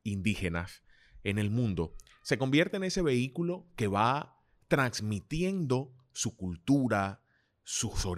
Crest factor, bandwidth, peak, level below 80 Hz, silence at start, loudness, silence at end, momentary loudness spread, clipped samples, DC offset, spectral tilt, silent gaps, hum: 20 dB; 15.5 kHz; -12 dBFS; -50 dBFS; 0.05 s; -31 LUFS; 0 s; 11 LU; under 0.1%; under 0.1%; -5 dB/octave; none; none